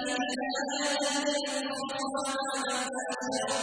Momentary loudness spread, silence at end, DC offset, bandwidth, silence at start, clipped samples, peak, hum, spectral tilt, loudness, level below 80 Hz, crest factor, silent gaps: 5 LU; 0 s; under 0.1%; 11 kHz; 0 s; under 0.1%; -18 dBFS; none; -1 dB/octave; -31 LUFS; -72 dBFS; 14 dB; none